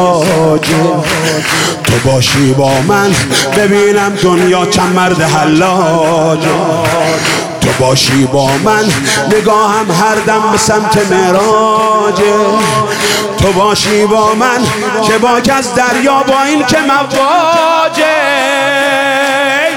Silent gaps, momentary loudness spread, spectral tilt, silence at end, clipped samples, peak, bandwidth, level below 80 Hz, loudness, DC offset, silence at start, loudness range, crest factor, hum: none; 3 LU; -4 dB/octave; 0 s; under 0.1%; 0 dBFS; 18 kHz; -38 dBFS; -9 LUFS; under 0.1%; 0 s; 1 LU; 10 dB; none